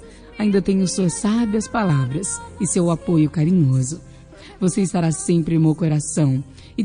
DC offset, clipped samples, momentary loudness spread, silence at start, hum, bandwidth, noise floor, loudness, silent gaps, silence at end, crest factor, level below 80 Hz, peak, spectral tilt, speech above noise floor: under 0.1%; under 0.1%; 7 LU; 0 s; none; 10 kHz; -42 dBFS; -20 LUFS; none; 0 s; 14 dB; -46 dBFS; -6 dBFS; -6.5 dB/octave; 23 dB